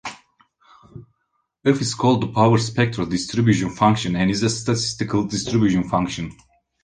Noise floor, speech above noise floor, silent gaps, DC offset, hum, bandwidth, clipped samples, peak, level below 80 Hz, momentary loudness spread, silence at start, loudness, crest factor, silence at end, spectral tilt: -72 dBFS; 53 dB; none; under 0.1%; none; 10 kHz; under 0.1%; -2 dBFS; -48 dBFS; 6 LU; 0.05 s; -20 LUFS; 18 dB; 0.5 s; -5.5 dB/octave